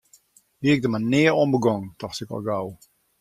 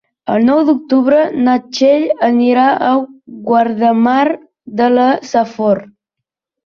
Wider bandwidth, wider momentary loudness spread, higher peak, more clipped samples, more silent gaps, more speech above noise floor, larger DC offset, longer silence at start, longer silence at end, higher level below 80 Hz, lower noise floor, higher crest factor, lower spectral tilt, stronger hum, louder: first, 14.5 kHz vs 7 kHz; first, 14 LU vs 6 LU; about the same, -4 dBFS vs -2 dBFS; neither; neither; second, 36 dB vs 68 dB; neither; first, 0.6 s vs 0.25 s; second, 0.45 s vs 0.8 s; about the same, -60 dBFS vs -58 dBFS; second, -58 dBFS vs -80 dBFS; first, 18 dB vs 12 dB; about the same, -6.5 dB/octave vs -6 dB/octave; neither; second, -23 LUFS vs -13 LUFS